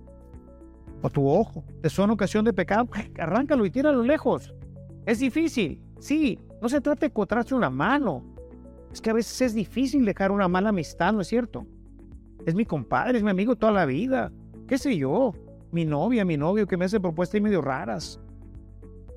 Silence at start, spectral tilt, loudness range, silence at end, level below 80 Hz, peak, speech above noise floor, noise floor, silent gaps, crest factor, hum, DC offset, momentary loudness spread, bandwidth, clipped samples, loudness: 0 s; -6.5 dB/octave; 2 LU; 0 s; -48 dBFS; -8 dBFS; 23 dB; -47 dBFS; none; 16 dB; none; under 0.1%; 11 LU; 14.5 kHz; under 0.1%; -25 LUFS